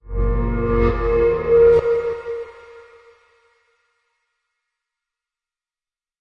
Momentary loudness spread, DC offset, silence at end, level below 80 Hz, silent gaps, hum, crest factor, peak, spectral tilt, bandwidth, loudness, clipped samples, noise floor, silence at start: 16 LU; under 0.1%; 3.4 s; -30 dBFS; none; none; 16 dB; -4 dBFS; -9.5 dB/octave; 5.4 kHz; -18 LUFS; under 0.1%; under -90 dBFS; 0.05 s